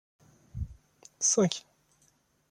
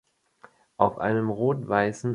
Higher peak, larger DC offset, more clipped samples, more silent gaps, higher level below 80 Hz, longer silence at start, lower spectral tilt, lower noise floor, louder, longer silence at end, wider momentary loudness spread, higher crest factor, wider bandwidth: second, -10 dBFS vs -4 dBFS; neither; neither; neither; first, -52 dBFS vs -60 dBFS; second, 0.55 s vs 0.8 s; second, -3.5 dB/octave vs -7.5 dB/octave; first, -69 dBFS vs -56 dBFS; second, -29 LUFS vs -25 LUFS; first, 0.9 s vs 0 s; first, 18 LU vs 2 LU; about the same, 24 dB vs 22 dB; about the same, 12 kHz vs 11 kHz